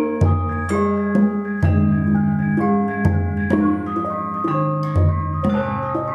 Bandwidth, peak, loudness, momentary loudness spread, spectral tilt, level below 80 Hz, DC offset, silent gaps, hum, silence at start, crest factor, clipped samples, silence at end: 9.6 kHz; -4 dBFS; -19 LUFS; 5 LU; -9.5 dB/octave; -36 dBFS; under 0.1%; none; none; 0 s; 14 dB; under 0.1%; 0 s